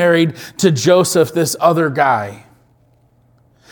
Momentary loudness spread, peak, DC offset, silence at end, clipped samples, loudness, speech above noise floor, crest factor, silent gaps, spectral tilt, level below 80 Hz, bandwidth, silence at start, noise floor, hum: 7 LU; 0 dBFS; under 0.1%; 1.35 s; under 0.1%; -14 LUFS; 40 dB; 16 dB; none; -5 dB/octave; -58 dBFS; 19 kHz; 0 s; -54 dBFS; none